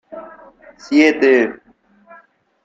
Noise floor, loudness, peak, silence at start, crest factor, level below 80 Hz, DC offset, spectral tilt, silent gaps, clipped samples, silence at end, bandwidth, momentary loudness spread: -53 dBFS; -14 LUFS; -2 dBFS; 0.1 s; 16 dB; -62 dBFS; under 0.1%; -4 dB/octave; none; under 0.1%; 1.1 s; 7.8 kHz; 23 LU